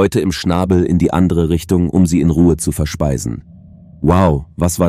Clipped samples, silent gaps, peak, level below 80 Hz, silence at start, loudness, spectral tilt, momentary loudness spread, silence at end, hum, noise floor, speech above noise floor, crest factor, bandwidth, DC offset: under 0.1%; none; 0 dBFS; -28 dBFS; 0 s; -15 LUFS; -6.5 dB/octave; 6 LU; 0 s; none; -39 dBFS; 26 dB; 14 dB; 15 kHz; under 0.1%